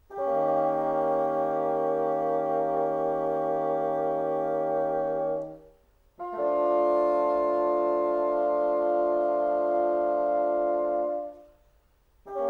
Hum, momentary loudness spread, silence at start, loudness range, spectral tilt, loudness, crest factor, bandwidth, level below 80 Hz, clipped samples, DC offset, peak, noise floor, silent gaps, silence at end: none; 5 LU; 0.1 s; 3 LU; -8.5 dB/octave; -26 LUFS; 12 dB; 4.5 kHz; -62 dBFS; under 0.1%; under 0.1%; -14 dBFS; -63 dBFS; none; 0 s